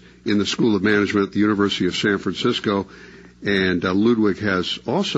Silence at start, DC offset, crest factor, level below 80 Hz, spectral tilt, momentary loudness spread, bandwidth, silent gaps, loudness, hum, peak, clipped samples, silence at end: 0.25 s; under 0.1%; 16 dB; -54 dBFS; -5.5 dB/octave; 5 LU; 8 kHz; none; -20 LUFS; none; -4 dBFS; under 0.1%; 0 s